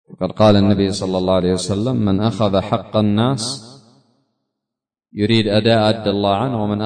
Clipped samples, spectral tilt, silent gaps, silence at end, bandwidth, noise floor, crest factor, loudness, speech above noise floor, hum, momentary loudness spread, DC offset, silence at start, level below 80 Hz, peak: under 0.1%; -6 dB/octave; none; 0 s; 9.6 kHz; -84 dBFS; 14 dB; -17 LUFS; 68 dB; none; 8 LU; under 0.1%; 0.1 s; -46 dBFS; -2 dBFS